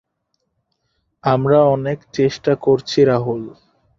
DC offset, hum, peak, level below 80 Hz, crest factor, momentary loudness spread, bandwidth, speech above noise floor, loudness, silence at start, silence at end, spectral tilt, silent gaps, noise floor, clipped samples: under 0.1%; none; -2 dBFS; -54 dBFS; 16 dB; 11 LU; 7.4 kHz; 55 dB; -17 LUFS; 1.25 s; 0.5 s; -7 dB/octave; none; -72 dBFS; under 0.1%